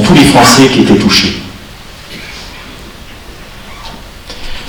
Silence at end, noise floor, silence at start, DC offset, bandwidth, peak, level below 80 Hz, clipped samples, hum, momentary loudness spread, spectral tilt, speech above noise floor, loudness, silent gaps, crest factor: 0 s; -30 dBFS; 0 s; under 0.1%; over 20 kHz; 0 dBFS; -30 dBFS; 2%; none; 26 LU; -4 dB/octave; 24 dB; -5 LUFS; none; 10 dB